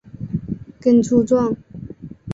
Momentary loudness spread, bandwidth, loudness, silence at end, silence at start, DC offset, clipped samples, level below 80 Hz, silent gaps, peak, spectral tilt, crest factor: 21 LU; 7.8 kHz; -19 LUFS; 0 s; 0.15 s; under 0.1%; under 0.1%; -48 dBFS; none; -2 dBFS; -8 dB/octave; 16 dB